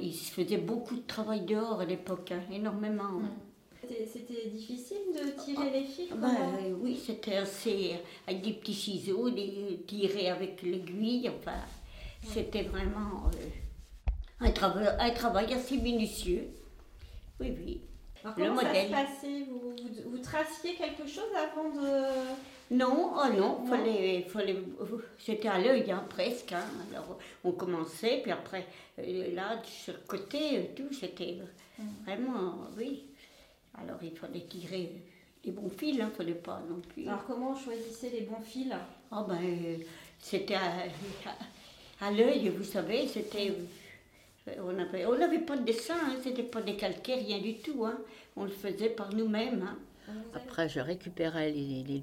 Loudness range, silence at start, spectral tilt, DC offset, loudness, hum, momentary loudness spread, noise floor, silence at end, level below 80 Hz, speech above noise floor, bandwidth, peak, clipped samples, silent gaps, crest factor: 7 LU; 0 s; -5.5 dB/octave; under 0.1%; -35 LUFS; none; 14 LU; -61 dBFS; 0 s; -48 dBFS; 27 dB; 16.5 kHz; -12 dBFS; under 0.1%; none; 22 dB